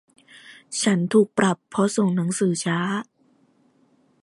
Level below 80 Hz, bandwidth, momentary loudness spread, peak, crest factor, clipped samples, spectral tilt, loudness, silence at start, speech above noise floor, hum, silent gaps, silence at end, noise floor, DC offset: -68 dBFS; 11.5 kHz; 7 LU; -6 dBFS; 18 dB; under 0.1%; -5 dB/octave; -22 LUFS; 0.45 s; 40 dB; none; none; 1.2 s; -61 dBFS; under 0.1%